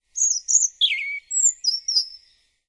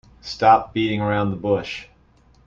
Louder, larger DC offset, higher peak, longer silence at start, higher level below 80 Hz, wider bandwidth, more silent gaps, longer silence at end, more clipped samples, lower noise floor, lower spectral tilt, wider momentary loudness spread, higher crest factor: about the same, -19 LUFS vs -20 LUFS; neither; about the same, -4 dBFS vs -2 dBFS; about the same, 0.15 s vs 0.25 s; second, -72 dBFS vs -50 dBFS; first, 11.5 kHz vs 7.6 kHz; neither; second, 0.5 s vs 0.65 s; neither; first, -60 dBFS vs -55 dBFS; second, 9 dB/octave vs -6.5 dB/octave; second, 7 LU vs 17 LU; about the same, 20 dB vs 20 dB